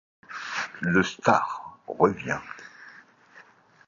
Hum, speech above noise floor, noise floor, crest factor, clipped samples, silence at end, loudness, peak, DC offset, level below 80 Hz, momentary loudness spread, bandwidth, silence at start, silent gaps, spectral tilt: none; 30 dB; -54 dBFS; 24 dB; under 0.1%; 0.45 s; -26 LUFS; -4 dBFS; under 0.1%; -60 dBFS; 20 LU; 7.6 kHz; 0.3 s; none; -5.5 dB/octave